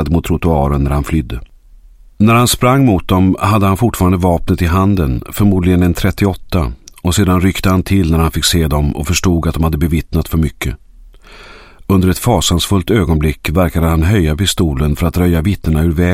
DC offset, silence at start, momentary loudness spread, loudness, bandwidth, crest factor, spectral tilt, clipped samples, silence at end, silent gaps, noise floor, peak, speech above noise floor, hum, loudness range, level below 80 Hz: under 0.1%; 0 s; 6 LU; -13 LUFS; 16.5 kHz; 12 dB; -5.5 dB/octave; under 0.1%; 0 s; none; -40 dBFS; 0 dBFS; 28 dB; none; 4 LU; -24 dBFS